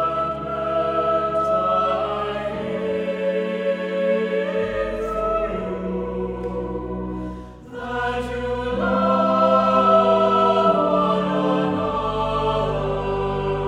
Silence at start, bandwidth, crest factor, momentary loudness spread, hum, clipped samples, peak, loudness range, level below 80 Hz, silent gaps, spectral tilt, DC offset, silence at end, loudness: 0 s; 10 kHz; 16 dB; 11 LU; none; under 0.1%; -4 dBFS; 9 LU; -40 dBFS; none; -7 dB/octave; under 0.1%; 0 s; -21 LUFS